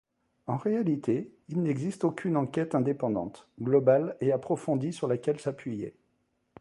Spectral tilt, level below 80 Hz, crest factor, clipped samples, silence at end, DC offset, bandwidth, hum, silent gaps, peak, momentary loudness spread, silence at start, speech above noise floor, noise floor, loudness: -8 dB/octave; -68 dBFS; 20 dB; under 0.1%; 0.7 s; under 0.1%; 11.5 kHz; none; none; -10 dBFS; 12 LU; 0.45 s; 46 dB; -74 dBFS; -29 LUFS